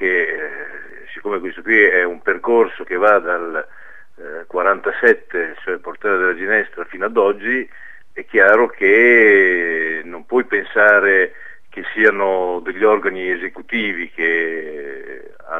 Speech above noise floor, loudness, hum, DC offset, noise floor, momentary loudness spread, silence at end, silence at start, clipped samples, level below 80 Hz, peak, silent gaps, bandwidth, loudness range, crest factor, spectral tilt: 21 dB; -16 LUFS; none; 1%; -37 dBFS; 19 LU; 0 s; 0 s; under 0.1%; -62 dBFS; 0 dBFS; none; 6.2 kHz; 6 LU; 18 dB; -6 dB/octave